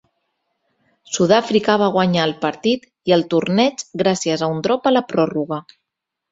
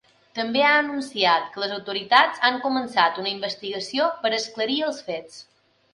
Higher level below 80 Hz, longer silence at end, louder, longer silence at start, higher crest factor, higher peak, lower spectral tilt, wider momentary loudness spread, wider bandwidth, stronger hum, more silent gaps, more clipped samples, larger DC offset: first, -60 dBFS vs -74 dBFS; first, 0.7 s vs 0.5 s; first, -18 LUFS vs -22 LUFS; first, 1.1 s vs 0.35 s; about the same, 18 dB vs 22 dB; about the same, -2 dBFS vs -2 dBFS; first, -5 dB/octave vs -3 dB/octave; second, 6 LU vs 12 LU; second, 8 kHz vs 11.5 kHz; neither; neither; neither; neither